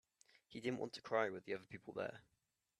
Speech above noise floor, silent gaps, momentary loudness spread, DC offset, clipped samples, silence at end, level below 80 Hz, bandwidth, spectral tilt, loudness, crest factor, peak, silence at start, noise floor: 27 dB; none; 11 LU; under 0.1%; under 0.1%; 0.6 s; -84 dBFS; 13 kHz; -5.5 dB/octave; -45 LUFS; 24 dB; -22 dBFS; 0.5 s; -72 dBFS